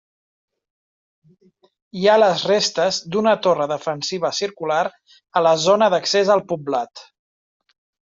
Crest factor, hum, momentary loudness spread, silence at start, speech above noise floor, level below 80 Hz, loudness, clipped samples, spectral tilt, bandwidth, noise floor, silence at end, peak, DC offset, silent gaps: 18 dB; none; 9 LU; 1.95 s; over 71 dB; -68 dBFS; -19 LUFS; under 0.1%; -3.5 dB/octave; 7.8 kHz; under -90 dBFS; 1.1 s; -4 dBFS; under 0.1%; none